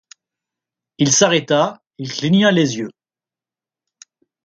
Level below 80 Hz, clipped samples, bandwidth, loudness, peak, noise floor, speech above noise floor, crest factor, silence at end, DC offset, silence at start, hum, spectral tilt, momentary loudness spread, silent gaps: -62 dBFS; under 0.1%; 9.4 kHz; -16 LUFS; 0 dBFS; under -90 dBFS; over 74 dB; 20 dB; 1.55 s; under 0.1%; 1 s; none; -4 dB/octave; 14 LU; none